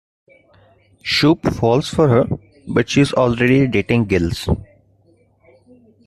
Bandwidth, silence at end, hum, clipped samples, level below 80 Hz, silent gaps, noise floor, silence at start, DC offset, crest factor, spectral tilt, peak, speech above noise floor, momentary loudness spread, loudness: 13.5 kHz; 1.45 s; none; under 0.1%; -40 dBFS; none; -56 dBFS; 1.05 s; under 0.1%; 16 dB; -6 dB/octave; -2 dBFS; 40 dB; 9 LU; -17 LUFS